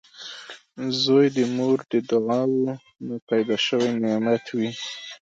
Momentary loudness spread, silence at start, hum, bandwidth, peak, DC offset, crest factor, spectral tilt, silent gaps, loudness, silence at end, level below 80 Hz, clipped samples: 17 LU; 0.15 s; none; 7.8 kHz; -8 dBFS; under 0.1%; 16 dB; -5.5 dB/octave; 3.22-3.27 s; -23 LUFS; 0.25 s; -72 dBFS; under 0.1%